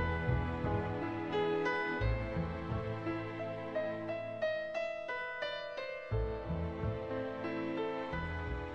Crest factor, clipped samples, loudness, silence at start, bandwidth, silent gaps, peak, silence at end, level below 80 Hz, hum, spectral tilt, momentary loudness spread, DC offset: 16 dB; under 0.1%; -38 LUFS; 0 s; 7.8 kHz; none; -22 dBFS; 0 s; -46 dBFS; none; -7.5 dB/octave; 5 LU; under 0.1%